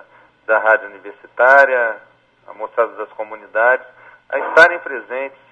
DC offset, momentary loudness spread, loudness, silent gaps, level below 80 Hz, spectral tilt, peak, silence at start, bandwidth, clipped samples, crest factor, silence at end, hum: under 0.1%; 20 LU; -15 LUFS; none; -66 dBFS; -3 dB/octave; 0 dBFS; 0.5 s; 10 kHz; under 0.1%; 18 dB; 0.25 s; none